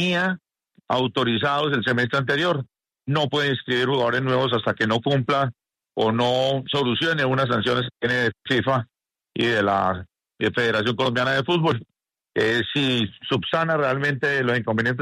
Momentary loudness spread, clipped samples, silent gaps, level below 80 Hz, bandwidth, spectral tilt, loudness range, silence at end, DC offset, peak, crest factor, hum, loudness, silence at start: 5 LU; under 0.1%; none; -60 dBFS; 13 kHz; -6 dB/octave; 1 LU; 0 s; under 0.1%; -8 dBFS; 14 dB; none; -22 LUFS; 0 s